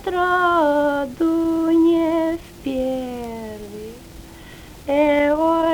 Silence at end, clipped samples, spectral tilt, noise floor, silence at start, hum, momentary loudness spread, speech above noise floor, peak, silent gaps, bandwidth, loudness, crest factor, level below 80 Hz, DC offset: 0 s; under 0.1%; -5.5 dB/octave; -40 dBFS; 0 s; none; 20 LU; 22 dB; -6 dBFS; none; 20 kHz; -19 LUFS; 14 dB; -46 dBFS; under 0.1%